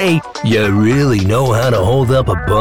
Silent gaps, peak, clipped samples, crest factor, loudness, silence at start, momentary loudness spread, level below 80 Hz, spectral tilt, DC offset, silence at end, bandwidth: none; -4 dBFS; under 0.1%; 8 dB; -13 LUFS; 0 s; 3 LU; -32 dBFS; -6.5 dB/octave; 2%; 0 s; 16.5 kHz